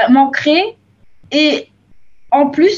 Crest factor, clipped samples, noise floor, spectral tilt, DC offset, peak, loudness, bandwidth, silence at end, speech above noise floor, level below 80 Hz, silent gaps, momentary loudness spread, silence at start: 14 dB; under 0.1%; -45 dBFS; -4 dB/octave; under 0.1%; 0 dBFS; -14 LUFS; 7.4 kHz; 0 s; 33 dB; -58 dBFS; none; 9 LU; 0 s